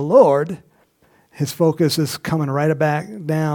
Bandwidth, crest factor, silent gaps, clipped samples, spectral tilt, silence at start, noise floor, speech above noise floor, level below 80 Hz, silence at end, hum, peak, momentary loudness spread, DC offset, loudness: 19 kHz; 18 dB; none; under 0.1%; -6 dB/octave; 0 s; -57 dBFS; 40 dB; -60 dBFS; 0 s; none; -2 dBFS; 13 LU; under 0.1%; -19 LUFS